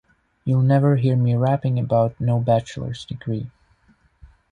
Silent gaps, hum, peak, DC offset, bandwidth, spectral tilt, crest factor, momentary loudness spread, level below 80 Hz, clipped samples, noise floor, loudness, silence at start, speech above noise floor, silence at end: none; none; -6 dBFS; under 0.1%; 9.2 kHz; -9 dB/octave; 16 dB; 14 LU; -52 dBFS; under 0.1%; -59 dBFS; -21 LUFS; 0.45 s; 40 dB; 1 s